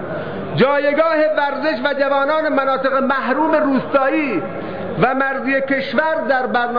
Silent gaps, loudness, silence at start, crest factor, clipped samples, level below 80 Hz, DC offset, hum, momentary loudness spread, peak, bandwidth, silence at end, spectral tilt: none; -17 LUFS; 0 s; 14 dB; under 0.1%; -56 dBFS; 1%; none; 7 LU; -4 dBFS; 5.2 kHz; 0 s; -8 dB/octave